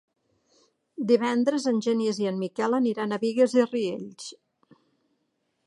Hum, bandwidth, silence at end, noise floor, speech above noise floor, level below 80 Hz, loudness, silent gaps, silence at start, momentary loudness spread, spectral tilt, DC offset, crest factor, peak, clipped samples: none; 11 kHz; 1.35 s; -75 dBFS; 51 dB; -80 dBFS; -25 LUFS; none; 1 s; 15 LU; -5.5 dB/octave; under 0.1%; 18 dB; -8 dBFS; under 0.1%